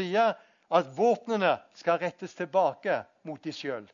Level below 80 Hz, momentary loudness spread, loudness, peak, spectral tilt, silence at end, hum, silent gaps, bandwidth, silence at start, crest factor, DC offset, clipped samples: -84 dBFS; 12 LU; -29 LUFS; -10 dBFS; -5.5 dB/octave; 0.1 s; none; none; 7.4 kHz; 0 s; 18 dB; under 0.1%; under 0.1%